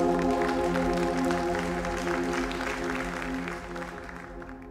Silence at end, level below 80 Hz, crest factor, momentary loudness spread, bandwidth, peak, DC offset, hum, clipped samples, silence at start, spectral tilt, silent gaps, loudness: 0 s; -44 dBFS; 16 dB; 13 LU; 16 kHz; -14 dBFS; under 0.1%; none; under 0.1%; 0 s; -5.5 dB/octave; none; -29 LUFS